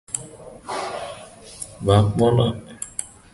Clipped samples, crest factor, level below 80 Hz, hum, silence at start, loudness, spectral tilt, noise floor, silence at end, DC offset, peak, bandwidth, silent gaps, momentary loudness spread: under 0.1%; 20 dB; -44 dBFS; none; 0.1 s; -22 LUFS; -5.5 dB/octave; -41 dBFS; 0.25 s; under 0.1%; -2 dBFS; 11.5 kHz; none; 21 LU